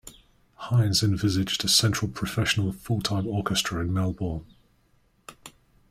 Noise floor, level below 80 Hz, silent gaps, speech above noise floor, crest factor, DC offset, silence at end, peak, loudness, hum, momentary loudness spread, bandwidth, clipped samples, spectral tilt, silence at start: -64 dBFS; -50 dBFS; none; 39 dB; 22 dB; under 0.1%; 0.4 s; -6 dBFS; -25 LUFS; none; 12 LU; 16 kHz; under 0.1%; -4 dB/octave; 0.05 s